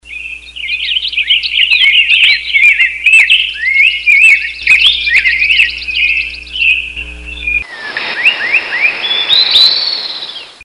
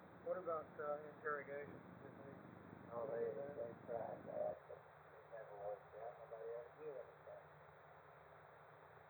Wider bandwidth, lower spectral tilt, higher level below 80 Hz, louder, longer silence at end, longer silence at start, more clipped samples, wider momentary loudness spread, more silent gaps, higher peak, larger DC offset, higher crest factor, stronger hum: about the same, 19.5 kHz vs over 20 kHz; second, 0.5 dB/octave vs -8.5 dB/octave; first, -38 dBFS vs -86 dBFS; first, -7 LUFS vs -50 LUFS; about the same, 0 s vs 0 s; about the same, 0.05 s vs 0 s; first, 0.3% vs under 0.1%; about the same, 15 LU vs 17 LU; neither; first, 0 dBFS vs -32 dBFS; first, 0.1% vs under 0.1%; second, 10 dB vs 18 dB; neither